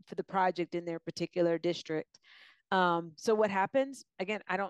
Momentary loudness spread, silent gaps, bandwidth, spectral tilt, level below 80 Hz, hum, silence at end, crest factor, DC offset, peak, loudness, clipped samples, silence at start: 10 LU; none; 12 kHz; -5.5 dB/octave; -82 dBFS; none; 0 s; 16 dB; under 0.1%; -16 dBFS; -33 LUFS; under 0.1%; 0.1 s